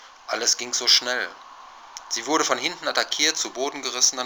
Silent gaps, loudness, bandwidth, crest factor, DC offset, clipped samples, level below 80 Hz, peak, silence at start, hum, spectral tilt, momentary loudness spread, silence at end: none; -22 LUFS; over 20 kHz; 22 dB; under 0.1%; under 0.1%; -70 dBFS; -2 dBFS; 0 s; none; 1 dB/octave; 13 LU; 0 s